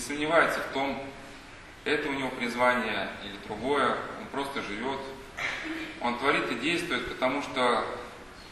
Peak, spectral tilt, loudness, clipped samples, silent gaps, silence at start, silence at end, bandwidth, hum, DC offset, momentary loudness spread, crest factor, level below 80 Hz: -8 dBFS; -3.5 dB/octave; -29 LUFS; under 0.1%; none; 0 s; 0 s; 13 kHz; none; under 0.1%; 15 LU; 22 dB; -56 dBFS